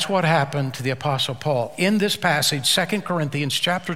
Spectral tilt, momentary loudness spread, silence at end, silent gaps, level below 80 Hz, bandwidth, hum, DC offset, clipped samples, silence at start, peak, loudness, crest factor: -4 dB/octave; 6 LU; 0 s; none; -60 dBFS; 16.5 kHz; none; 0.5%; under 0.1%; 0 s; -4 dBFS; -21 LUFS; 18 dB